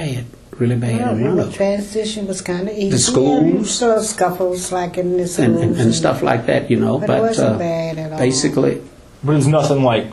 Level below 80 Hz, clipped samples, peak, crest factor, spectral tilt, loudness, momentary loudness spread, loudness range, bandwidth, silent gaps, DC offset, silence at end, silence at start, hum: -46 dBFS; under 0.1%; 0 dBFS; 16 dB; -5.5 dB/octave; -17 LUFS; 8 LU; 1 LU; 13.5 kHz; none; under 0.1%; 0 s; 0 s; none